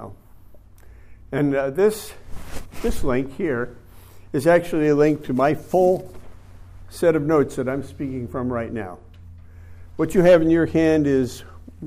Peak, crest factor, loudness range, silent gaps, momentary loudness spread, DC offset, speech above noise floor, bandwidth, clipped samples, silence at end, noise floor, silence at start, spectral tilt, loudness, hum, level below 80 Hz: -6 dBFS; 16 dB; 4 LU; none; 20 LU; under 0.1%; 25 dB; 15.5 kHz; under 0.1%; 0 s; -45 dBFS; 0 s; -7 dB/octave; -21 LUFS; none; -40 dBFS